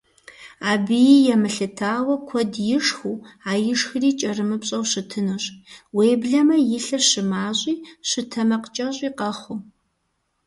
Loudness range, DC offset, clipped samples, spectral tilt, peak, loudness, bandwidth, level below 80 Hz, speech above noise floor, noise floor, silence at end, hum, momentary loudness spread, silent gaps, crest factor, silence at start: 3 LU; under 0.1%; under 0.1%; -3.5 dB/octave; -4 dBFS; -21 LUFS; 11.5 kHz; -64 dBFS; 51 dB; -72 dBFS; 0.85 s; none; 11 LU; none; 18 dB; 0.4 s